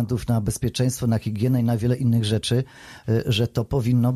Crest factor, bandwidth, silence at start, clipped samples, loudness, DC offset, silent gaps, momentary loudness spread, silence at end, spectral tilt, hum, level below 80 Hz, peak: 12 dB; 14.5 kHz; 0 s; under 0.1%; -23 LUFS; under 0.1%; none; 4 LU; 0 s; -6.5 dB/octave; none; -44 dBFS; -10 dBFS